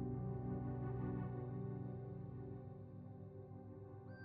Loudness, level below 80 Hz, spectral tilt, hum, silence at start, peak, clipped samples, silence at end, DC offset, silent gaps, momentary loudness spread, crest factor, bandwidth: -48 LUFS; -62 dBFS; -11 dB/octave; 60 Hz at -75 dBFS; 0 s; -34 dBFS; under 0.1%; 0 s; under 0.1%; none; 11 LU; 14 dB; 3 kHz